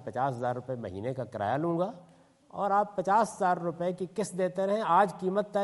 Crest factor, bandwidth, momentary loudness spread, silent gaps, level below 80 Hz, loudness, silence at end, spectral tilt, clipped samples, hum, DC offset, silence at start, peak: 18 dB; 11.5 kHz; 10 LU; none; -74 dBFS; -30 LUFS; 0 s; -6.5 dB/octave; under 0.1%; none; under 0.1%; 0 s; -12 dBFS